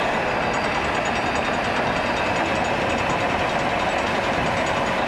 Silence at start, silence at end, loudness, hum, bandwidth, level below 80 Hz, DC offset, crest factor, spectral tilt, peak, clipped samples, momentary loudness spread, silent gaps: 0 s; 0 s; -22 LUFS; none; 14.5 kHz; -42 dBFS; under 0.1%; 12 dB; -4.5 dB/octave; -10 dBFS; under 0.1%; 0 LU; none